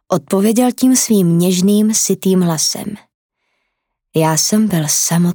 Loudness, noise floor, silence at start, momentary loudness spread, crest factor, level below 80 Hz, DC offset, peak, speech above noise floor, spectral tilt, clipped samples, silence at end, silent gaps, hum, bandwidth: -13 LUFS; -73 dBFS; 0.1 s; 5 LU; 12 dB; -60 dBFS; under 0.1%; -2 dBFS; 60 dB; -4.5 dB/octave; under 0.1%; 0 s; 3.14-3.29 s; none; over 20 kHz